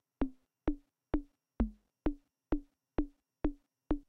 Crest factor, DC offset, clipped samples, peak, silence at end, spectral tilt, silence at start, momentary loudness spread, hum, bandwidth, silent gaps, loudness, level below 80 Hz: 20 dB; under 0.1%; under 0.1%; -18 dBFS; 0.1 s; -10 dB/octave; 0.2 s; 5 LU; none; 4.4 kHz; none; -41 LUFS; -44 dBFS